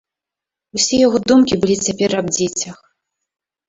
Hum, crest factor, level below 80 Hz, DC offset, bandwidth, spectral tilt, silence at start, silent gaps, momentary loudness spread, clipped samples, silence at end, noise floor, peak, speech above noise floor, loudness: none; 16 dB; -50 dBFS; under 0.1%; 8 kHz; -3.5 dB/octave; 0.75 s; none; 11 LU; under 0.1%; 0.95 s; -86 dBFS; -2 dBFS; 70 dB; -16 LUFS